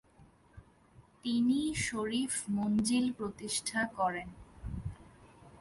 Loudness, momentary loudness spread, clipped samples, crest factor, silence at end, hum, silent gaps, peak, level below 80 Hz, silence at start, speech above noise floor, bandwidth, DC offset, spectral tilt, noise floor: -33 LUFS; 14 LU; under 0.1%; 16 dB; 0 s; none; none; -20 dBFS; -56 dBFS; 0.2 s; 29 dB; 11.5 kHz; under 0.1%; -4 dB/octave; -62 dBFS